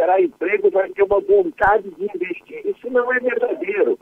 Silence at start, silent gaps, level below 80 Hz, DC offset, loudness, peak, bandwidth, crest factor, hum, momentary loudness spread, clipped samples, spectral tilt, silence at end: 0 s; none; -50 dBFS; under 0.1%; -19 LUFS; -4 dBFS; 3.9 kHz; 14 dB; none; 11 LU; under 0.1%; -7.5 dB/octave; 0.05 s